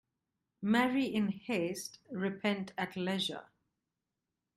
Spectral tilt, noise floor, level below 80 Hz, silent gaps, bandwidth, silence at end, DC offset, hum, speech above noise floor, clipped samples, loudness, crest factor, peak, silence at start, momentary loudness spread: -5 dB/octave; -88 dBFS; -76 dBFS; none; 15 kHz; 1.15 s; under 0.1%; none; 54 dB; under 0.1%; -35 LUFS; 18 dB; -18 dBFS; 0.6 s; 11 LU